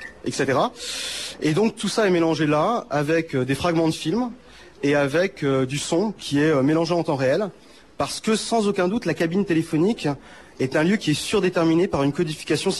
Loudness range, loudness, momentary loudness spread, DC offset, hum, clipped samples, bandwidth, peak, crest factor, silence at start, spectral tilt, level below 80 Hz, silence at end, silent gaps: 1 LU; -22 LUFS; 7 LU; 0.2%; none; under 0.1%; 12.5 kHz; -10 dBFS; 12 dB; 0 s; -5 dB/octave; -54 dBFS; 0 s; none